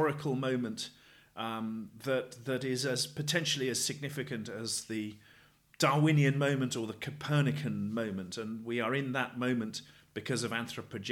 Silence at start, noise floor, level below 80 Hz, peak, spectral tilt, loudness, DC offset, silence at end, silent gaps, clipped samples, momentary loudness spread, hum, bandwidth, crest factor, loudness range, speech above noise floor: 0 s; -62 dBFS; -74 dBFS; -14 dBFS; -4.5 dB/octave; -33 LUFS; under 0.1%; 0 s; none; under 0.1%; 12 LU; none; 16 kHz; 20 dB; 4 LU; 29 dB